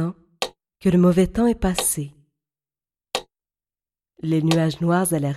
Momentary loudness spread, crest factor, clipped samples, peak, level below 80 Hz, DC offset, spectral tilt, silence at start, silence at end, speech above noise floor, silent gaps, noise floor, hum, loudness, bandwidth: 12 LU; 18 dB; under 0.1%; -4 dBFS; -42 dBFS; under 0.1%; -5.5 dB/octave; 0 s; 0 s; over 71 dB; none; under -90 dBFS; none; -21 LUFS; 15 kHz